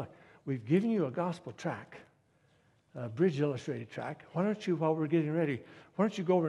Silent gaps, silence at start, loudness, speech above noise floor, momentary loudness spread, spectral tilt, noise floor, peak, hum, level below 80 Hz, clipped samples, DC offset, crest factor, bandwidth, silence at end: none; 0 s; -33 LUFS; 37 dB; 14 LU; -8 dB/octave; -69 dBFS; -14 dBFS; none; -74 dBFS; under 0.1%; under 0.1%; 18 dB; 11 kHz; 0 s